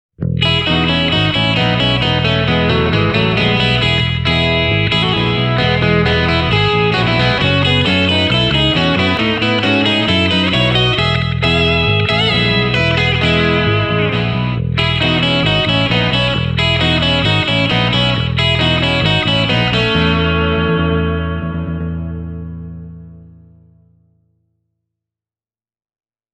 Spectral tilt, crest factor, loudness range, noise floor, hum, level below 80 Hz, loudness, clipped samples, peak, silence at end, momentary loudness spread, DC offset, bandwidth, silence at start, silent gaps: -6 dB/octave; 14 dB; 5 LU; under -90 dBFS; none; -30 dBFS; -13 LUFS; under 0.1%; 0 dBFS; 3.1 s; 4 LU; under 0.1%; 8.8 kHz; 0.2 s; none